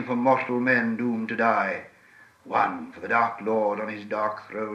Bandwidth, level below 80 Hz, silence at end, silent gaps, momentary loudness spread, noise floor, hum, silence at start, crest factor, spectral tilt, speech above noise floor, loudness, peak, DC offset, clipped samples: 8.2 kHz; -76 dBFS; 0 s; none; 8 LU; -54 dBFS; none; 0 s; 18 dB; -7 dB/octave; 29 dB; -25 LUFS; -8 dBFS; under 0.1%; under 0.1%